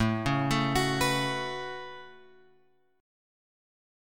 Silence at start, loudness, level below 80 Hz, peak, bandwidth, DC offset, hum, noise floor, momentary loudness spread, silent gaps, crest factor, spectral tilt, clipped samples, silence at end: 0 s; -28 LUFS; -50 dBFS; -14 dBFS; 17.5 kHz; under 0.1%; none; -67 dBFS; 15 LU; none; 18 dB; -4.5 dB/octave; under 0.1%; 1 s